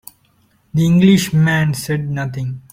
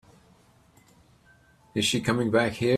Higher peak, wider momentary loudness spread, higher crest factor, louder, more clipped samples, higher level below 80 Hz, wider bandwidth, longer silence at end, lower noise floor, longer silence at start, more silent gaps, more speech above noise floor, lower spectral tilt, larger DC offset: first, -2 dBFS vs -10 dBFS; first, 12 LU vs 4 LU; about the same, 14 dB vs 18 dB; first, -16 LUFS vs -25 LUFS; neither; first, -46 dBFS vs -60 dBFS; about the same, 16.5 kHz vs 15.5 kHz; first, 0.15 s vs 0 s; about the same, -57 dBFS vs -59 dBFS; second, 0.75 s vs 1.75 s; neither; first, 42 dB vs 35 dB; first, -6 dB/octave vs -4.5 dB/octave; neither